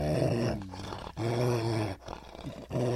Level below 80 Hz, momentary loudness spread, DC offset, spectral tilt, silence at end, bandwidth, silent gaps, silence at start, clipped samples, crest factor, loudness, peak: -50 dBFS; 14 LU; under 0.1%; -7 dB/octave; 0 s; 14 kHz; none; 0 s; under 0.1%; 18 dB; -33 LUFS; -14 dBFS